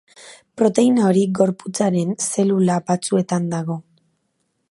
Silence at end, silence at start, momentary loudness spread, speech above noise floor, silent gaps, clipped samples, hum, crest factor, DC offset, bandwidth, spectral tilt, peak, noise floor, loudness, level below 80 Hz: 0.9 s; 0.2 s; 9 LU; 52 dB; none; under 0.1%; none; 18 dB; under 0.1%; 11.5 kHz; -6 dB/octave; 0 dBFS; -70 dBFS; -19 LUFS; -66 dBFS